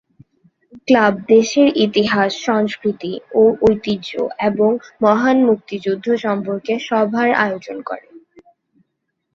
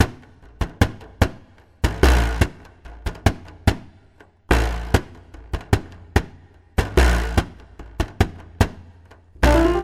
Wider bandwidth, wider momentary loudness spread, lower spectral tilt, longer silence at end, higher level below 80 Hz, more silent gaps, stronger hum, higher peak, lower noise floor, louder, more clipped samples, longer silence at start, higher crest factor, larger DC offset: second, 7.4 kHz vs 15.5 kHz; second, 10 LU vs 16 LU; about the same, -5.5 dB/octave vs -6 dB/octave; first, 1.15 s vs 0 s; second, -54 dBFS vs -24 dBFS; neither; neither; about the same, -2 dBFS vs 0 dBFS; first, -74 dBFS vs -52 dBFS; first, -16 LUFS vs -22 LUFS; neither; first, 0.75 s vs 0 s; second, 16 dB vs 22 dB; neither